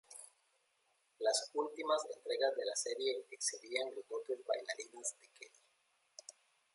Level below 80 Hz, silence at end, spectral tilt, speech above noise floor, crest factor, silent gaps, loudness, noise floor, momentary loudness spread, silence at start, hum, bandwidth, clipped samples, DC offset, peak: under -90 dBFS; 0.45 s; 1 dB/octave; 38 dB; 22 dB; none; -39 LUFS; -78 dBFS; 21 LU; 0.1 s; none; 11.5 kHz; under 0.1%; under 0.1%; -20 dBFS